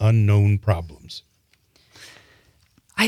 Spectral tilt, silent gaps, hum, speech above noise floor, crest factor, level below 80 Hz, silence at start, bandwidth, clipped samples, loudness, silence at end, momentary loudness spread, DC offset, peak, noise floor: -6.5 dB/octave; none; none; 43 dB; 18 dB; -52 dBFS; 0 s; 13.5 kHz; under 0.1%; -20 LUFS; 0 s; 25 LU; under 0.1%; -4 dBFS; -62 dBFS